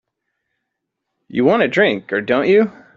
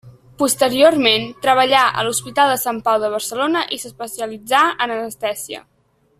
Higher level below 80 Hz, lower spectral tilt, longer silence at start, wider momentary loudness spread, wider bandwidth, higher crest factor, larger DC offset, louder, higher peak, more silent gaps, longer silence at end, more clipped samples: about the same, -60 dBFS vs -58 dBFS; first, -4 dB/octave vs -2.5 dB/octave; first, 1.35 s vs 0.05 s; second, 6 LU vs 14 LU; second, 7.4 kHz vs 16 kHz; about the same, 16 dB vs 18 dB; neither; about the same, -16 LUFS vs -17 LUFS; about the same, -2 dBFS vs 0 dBFS; neither; second, 0.25 s vs 0.6 s; neither